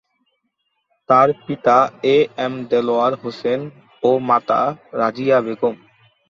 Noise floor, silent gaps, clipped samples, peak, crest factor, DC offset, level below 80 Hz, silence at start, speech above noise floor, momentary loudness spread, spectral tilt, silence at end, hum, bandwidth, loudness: -71 dBFS; none; under 0.1%; -2 dBFS; 18 dB; under 0.1%; -64 dBFS; 1.1 s; 54 dB; 9 LU; -6.5 dB/octave; 0.55 s; none; 7.2 kHz; -18 LUFS